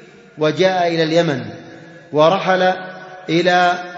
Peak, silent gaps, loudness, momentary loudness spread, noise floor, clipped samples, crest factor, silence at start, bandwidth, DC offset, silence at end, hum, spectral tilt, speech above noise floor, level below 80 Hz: 0 dBFS; none; -16 LUFS; 17 LU; -38 dBFS; under 0.1%; 16 dB; 0.35 s; 7.8 kHz; under 0.1%; 0 s; none; -5.5 dB/octave; 23 dB; -64 dBFS